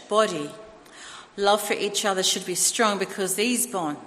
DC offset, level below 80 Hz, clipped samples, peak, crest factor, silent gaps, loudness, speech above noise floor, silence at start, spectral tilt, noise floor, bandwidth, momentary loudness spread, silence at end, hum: under 0.1%; -68 dBFS; under 0.1%; -6 dBFS; 20 dB; none; -23 LUFS; 20 dB; 0 s; -2 dB/octave; -44 dBFS; 15.5 kHz; 17 LU; 0 s; none